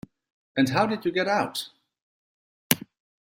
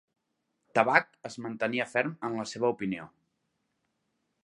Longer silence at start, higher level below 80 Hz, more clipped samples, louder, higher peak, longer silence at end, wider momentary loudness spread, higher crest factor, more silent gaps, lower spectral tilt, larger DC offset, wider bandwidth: second, 0.55 s vs 0.75 s; first, -64 dBFS vs -76 dBFS; neither; first, -26 LUFS vs -29 LUFS; first, 0 dBFS vs -6 dBFS; second, 0.5 s vs 1.35 s; second, 10 LU vs 15 LU; about the same, 28 dB vs 28 dB; first, 2.02-2.70 s vs none; about the same, -4 dB/octave vs -5 dB/octave; neither; first, 16 kHz vs 11.5 kHz